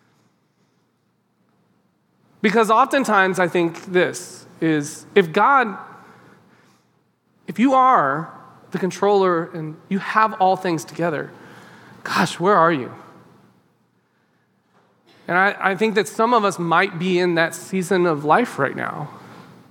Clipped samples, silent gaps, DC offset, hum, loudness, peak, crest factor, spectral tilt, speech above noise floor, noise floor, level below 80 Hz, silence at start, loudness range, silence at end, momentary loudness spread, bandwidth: under 0.1%; none; under 0.1%; none; -19 LUFS; 0 dBFS; 20 dB; -5 dB/octave; 47 dB; -66 dBFS; -78 dBFS; 2.45 s; 4 LU; 0.3 s; 16 LU; 18 kHz